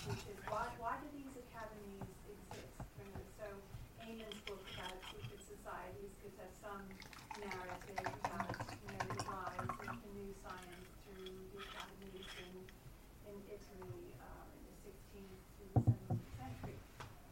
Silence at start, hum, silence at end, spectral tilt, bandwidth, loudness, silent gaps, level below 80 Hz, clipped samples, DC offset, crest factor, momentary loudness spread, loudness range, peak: 0 s; none; 0 s; -5.5 dB/octave; 16 kHz; -48 LUFS; none; -60 dBFS; under 0.1%; under 0.1%; 26 dB; 13 LU; 9 LU; -22 dBFS